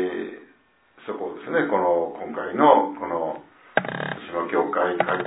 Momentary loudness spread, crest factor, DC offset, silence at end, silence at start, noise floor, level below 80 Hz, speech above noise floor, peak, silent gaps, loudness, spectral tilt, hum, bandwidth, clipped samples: 15 LU; 22 dB; under 0.1%; 0 s; 0 s; -59 dBFS; -68 dBFS; 37 dB; -2 dBFS; none; -24 LUFS; -9.5 dB/octave; none; 4 kHz; under 0.1%